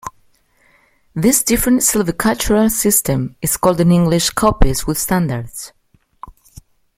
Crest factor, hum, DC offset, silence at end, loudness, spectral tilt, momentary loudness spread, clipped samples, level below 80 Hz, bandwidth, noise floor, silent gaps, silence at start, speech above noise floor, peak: 16 dB; none; under 0.1%; 0.65 s; -15 LUFS; -4.5 dB/octave; 13 LU; under 0.1%; -28 dBFS; 16.5 kHz; -55 dBFS; none; 0.05 s; 41 dB; 0 dBFS